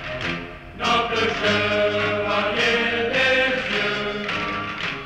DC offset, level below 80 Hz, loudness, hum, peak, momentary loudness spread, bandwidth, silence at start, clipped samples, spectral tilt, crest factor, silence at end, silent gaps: under 0.1%; -46 dBFS; -21 LUFS; none; -6 dBFS; 8 LU; 14.5 kHz; 0 s; under 0.1%; -4 dB/octave; 16 dB; 0 s; none